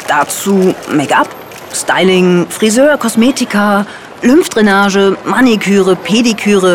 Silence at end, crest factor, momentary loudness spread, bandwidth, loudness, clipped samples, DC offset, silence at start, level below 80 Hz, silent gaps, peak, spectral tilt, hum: 0 s; 10 dB; 6 LU; 17 kHz; -10 LUFS; under 0.1%; 0.3%; 0 s; -48 dBFS; none; 0 dBFS; -4.5 dB/octave; none